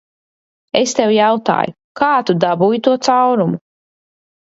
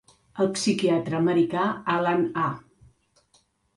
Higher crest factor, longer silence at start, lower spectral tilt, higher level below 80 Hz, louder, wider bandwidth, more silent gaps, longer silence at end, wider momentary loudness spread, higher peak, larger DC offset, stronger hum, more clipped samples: about the same, 16 dB vs 16 dB; first, 0.75 s vs 0.35 s; about the same, -5 dB/octave vs -5.5 dB/octave; about the same, -62 dBFS vs -64 dBFS; first, -15 LUFS vs -24 LUFS; second, 8 kHz vs 11.5 kHz; first, 1.84-1.95 s vs none; second, 0.85 s vs 1.15 s; about the same, 7 LU vs 6 LU; first, 0 dBFS vs -10 dBFS; neither; neither; neither